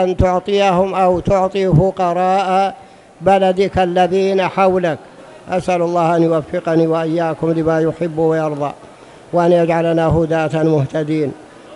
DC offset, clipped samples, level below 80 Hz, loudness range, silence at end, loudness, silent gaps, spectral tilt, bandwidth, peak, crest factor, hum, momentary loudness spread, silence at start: under 0.1%; under 0.1%; -38 dBFS; 2 LU; 0 s; -15 LUFS; none; -7.5 dB/octave; 11.5 kHz; 0 dBFS; 16 dB; none; 7 LU; 0 s